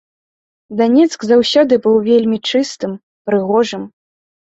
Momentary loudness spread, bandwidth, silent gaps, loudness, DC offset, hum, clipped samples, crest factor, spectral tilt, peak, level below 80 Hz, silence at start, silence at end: 14 LU; 8 kHz; 3.03-3.25 s; -14 LUFS; under 0.1%; none; under 0.1%; 14 dB; -5 dB/octave; -2 dBFS; -58 dBFS; 0.7 s; 0.7 s